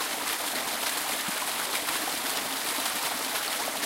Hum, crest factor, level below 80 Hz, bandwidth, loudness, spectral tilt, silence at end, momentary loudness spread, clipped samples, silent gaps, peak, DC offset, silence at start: none; 18 dB; -68 dBFS; 16 kHz; -28 LUFS; 0.5 dB/octave; 0 s; 1 LU; under 0.1%; none; -12 dBFS; under 0.1%; 0 s